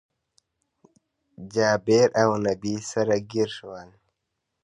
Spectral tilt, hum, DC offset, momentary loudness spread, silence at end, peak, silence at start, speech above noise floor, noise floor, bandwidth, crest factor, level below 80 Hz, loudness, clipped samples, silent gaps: -5 dB/octave; none; under 0.1%; 20 LU; 0.8 s; -6 dBFS; 1.4 s; 57 dB; -80 dBFS; 11 kHz; 20 dB; -62 dBFS; -23 LUFS; under 0.1%; none